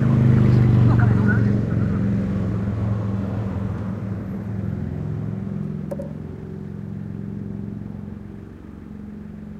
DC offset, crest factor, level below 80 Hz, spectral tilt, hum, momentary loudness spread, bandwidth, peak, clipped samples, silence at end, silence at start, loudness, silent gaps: under 0.1%; 16 dB; -40 dBFS; -10 dB/octave; none; 20 LU; 5.2 kHz; -6 dBFS; under 0.1%; 0 s; 0 s; -22 LUFS; none